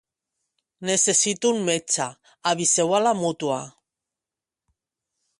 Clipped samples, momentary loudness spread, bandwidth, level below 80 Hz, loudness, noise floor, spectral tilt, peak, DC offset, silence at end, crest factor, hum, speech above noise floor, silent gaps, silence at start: under 0.1%; 12 LU; 11.5 kHz; -70 dBFS; -22 LUFS; -89 dBFS; -2.5 dB/octave; -6 dBFS; under 0.1%; 1.7 s; 20 dB; none; 66 dB; none; 0.8 s